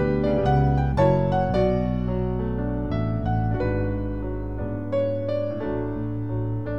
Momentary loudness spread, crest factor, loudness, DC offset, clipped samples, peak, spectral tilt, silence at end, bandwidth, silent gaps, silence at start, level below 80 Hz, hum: 8 LU; 16 dB; -24 LUFS; 1%; under 0.1%; -6 dBFS; -10 dB/octave; 0 s; 6.6 kHz; none; 0 s; -34 dBFS; none